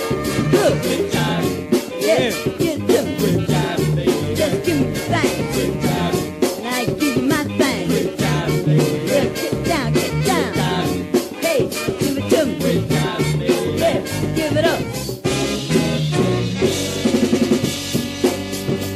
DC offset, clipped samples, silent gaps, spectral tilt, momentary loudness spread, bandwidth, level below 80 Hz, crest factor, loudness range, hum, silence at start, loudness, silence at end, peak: under 0.1%; under 0.1%; none; -5 dB/octave; 4 LU; 15.5 kHz; -40 dBFS; 16 dB; 1 LU; none; 0 s; -19 LUFS; 0 s; -4 dBFS